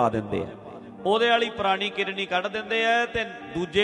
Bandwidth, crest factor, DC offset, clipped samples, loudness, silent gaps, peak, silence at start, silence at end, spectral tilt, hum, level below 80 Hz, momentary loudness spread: 10 kHz; 16 dB; under 0.1%; under 0.1%; -25 LUFS; none; -10 dBFS; 0 s; 0 s; -4.5 dB/octave; none; -54 dBFS; 10 LU